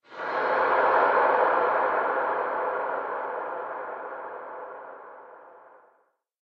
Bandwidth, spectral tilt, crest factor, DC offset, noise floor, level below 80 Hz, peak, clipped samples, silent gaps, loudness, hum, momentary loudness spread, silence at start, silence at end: 6 kHz; -5.5 dB/octave; 18 dB; under 0.1%; -68 dBFS; -72 dBFS; -8 dBFS; under 0.1%; none; -25 LUFS; none; 19 LU; 0.1 s; 0.85 s